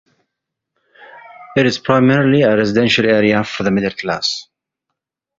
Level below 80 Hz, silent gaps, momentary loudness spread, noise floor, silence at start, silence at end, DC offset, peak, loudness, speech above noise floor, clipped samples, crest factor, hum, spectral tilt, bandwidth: -52 dBFS; none; 8 LU; -79 dBFS; 1 s; 0.95 s; under 0.1%; 0 dBFS; -14 LUFS; 65 dB; under 0.1%; 16 dB; none; -5.5 dB/octave; 7.8 kHz